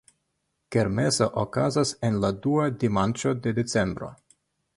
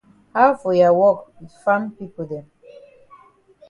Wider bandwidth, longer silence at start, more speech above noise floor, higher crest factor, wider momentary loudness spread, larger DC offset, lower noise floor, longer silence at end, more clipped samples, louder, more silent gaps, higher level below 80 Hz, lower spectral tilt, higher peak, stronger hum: about the same, 11.5 kHz vs 10.5 kHz; first, 0.7 s vs 0.35 s; first, 52 dB vs 33 dB; about the same, 18 dB vs 20 dB; second, 4 LU vs 17 LU; neither; first, -77 dBFS vs -51 dBFS; second, 0.65 s vs 1.3 s; neither; second, -25 LUFS vs -18 LUFS; neither; first, -52 dBFS vs -64 dBFS; second, -5.5 dB/octave vs -7.5 dB/octave; second, -8 dBFS vs -2 dBFS; neither